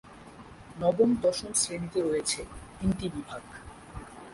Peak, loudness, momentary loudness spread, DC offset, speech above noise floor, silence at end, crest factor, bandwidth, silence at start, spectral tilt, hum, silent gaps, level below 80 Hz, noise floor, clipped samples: -12 dBFS; -29 LUFS; 23 LU; under 0.1%; 20 dB; 0 s; 20 dB; 11.5 kHz; 0.05 s; -4 dB/octave; none; none; -50 dBFS; -48 dBFS; under 0.1%